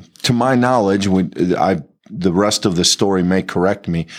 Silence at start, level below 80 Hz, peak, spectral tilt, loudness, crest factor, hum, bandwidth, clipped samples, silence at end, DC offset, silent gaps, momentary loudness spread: 0 s; -52 dBFS; -2 dBFS; -4.5 dB/octave; -16 LUFS; 14 dB; none; 15 kHz; under 0.1%; 0 s; under 0.1%; none; 6 LU